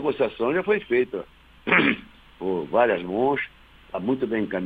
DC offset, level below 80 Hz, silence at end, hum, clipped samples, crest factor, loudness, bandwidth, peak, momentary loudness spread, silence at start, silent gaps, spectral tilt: under 0.1%; -56 dBFS; 0 s; none; under 0.1%; 20 dB; -24 LUFS; 4.9 kHz; -4 dBFS; 14 LU; 0 s; none; -8 dB/octave